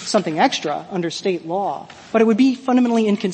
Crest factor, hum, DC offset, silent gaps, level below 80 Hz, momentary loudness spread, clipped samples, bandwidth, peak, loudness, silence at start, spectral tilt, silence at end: 16 dB; none; under 0.1%; none; -66 dBFS; 9 LU; under 0.1%; 8.8 kHz; -2 dBFS; -19 LUFS; 0 s; -5 dB/octave; 0 s